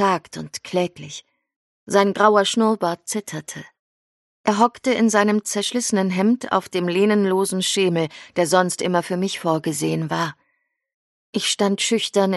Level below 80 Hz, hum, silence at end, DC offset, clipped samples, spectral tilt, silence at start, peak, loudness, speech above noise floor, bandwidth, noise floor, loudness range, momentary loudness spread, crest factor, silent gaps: -68 dBFS; none; 0 s; under 0.1%; under 0.1%; -4 dB/octave; 0 s; -2 dBFS; -20 LUFS; 51 dB; 12 kHz; -71 dBFS; 3 LU; 11 LU; 20 dB; 1.56-1.87 s, 3.79-4.44 s, 10.94-11.33 s